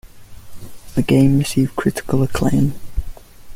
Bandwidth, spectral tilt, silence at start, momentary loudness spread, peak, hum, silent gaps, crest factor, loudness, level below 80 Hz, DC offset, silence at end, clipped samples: 16 kHz; -6.5 dB/octave; 0.05 s; 15 LU; -2 dBFS; none; none; 16 dB; -18 LUFS; -32 dBFS; under 0.1%; 0 s; under 0.1%